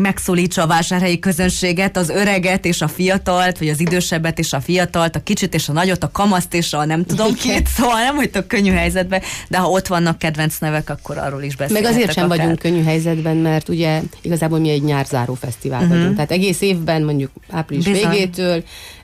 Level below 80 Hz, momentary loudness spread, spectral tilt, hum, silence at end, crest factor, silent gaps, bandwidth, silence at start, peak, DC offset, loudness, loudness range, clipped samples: -34 dBFS; 6 LU; -5 dB/octave; none; 0.05 s; 12 dB; none; 15.5 kHz; 0 s; -4 dBFS; under 0.1%; -17 LUFS; 2 LU; under 0.1%